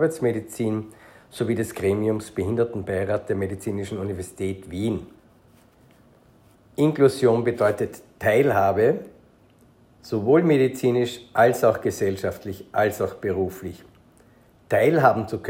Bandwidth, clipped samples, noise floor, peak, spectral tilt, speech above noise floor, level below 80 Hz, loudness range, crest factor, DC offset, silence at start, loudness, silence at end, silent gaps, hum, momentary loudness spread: 16.5 kHz; under 0.1%; -55 dBFS; -4 dBFS; -6.5 dB/octave; 33 dB; -60 dBFS; 7 LU; 20 dB; under 0.1%; 0 s; -23 LUFS; 0 s; none; none; 12 LU